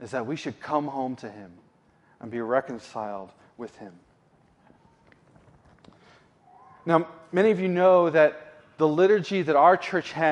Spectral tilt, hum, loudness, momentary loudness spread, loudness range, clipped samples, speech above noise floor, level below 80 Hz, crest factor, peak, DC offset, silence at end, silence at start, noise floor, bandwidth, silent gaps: -6.5 dB/octave; none; -23 LUFS; 22 LU; 16 LU; under 0.1%; 38 dB; -72 dBFS; 20 dB; -6 dBFS; under 0.1%; 0 s; 0 s; -62 dBFS; 10 kHz; none